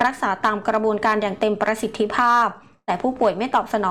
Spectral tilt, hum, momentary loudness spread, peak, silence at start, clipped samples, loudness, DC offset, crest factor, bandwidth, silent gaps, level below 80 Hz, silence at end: -5 dB/octave; none; 7 LU; -8 dBFS; 0 s; under 0.1%; -21 LUFS; 0.2%; 12 dB; 15 kHz; none; -56 dBFS; 0 s